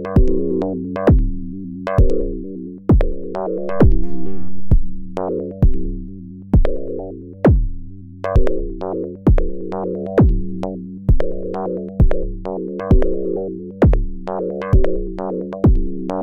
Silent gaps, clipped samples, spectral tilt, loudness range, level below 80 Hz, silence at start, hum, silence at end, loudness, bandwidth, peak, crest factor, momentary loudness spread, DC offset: none; under 0.1%; -10.5 dB/octave; 2 LU; -20 dBFS; 0 s; none; 0 s; -20 LUFS; 4.3 kHz; -2 dBFS; 14 dB; 13 LU; under 0.1%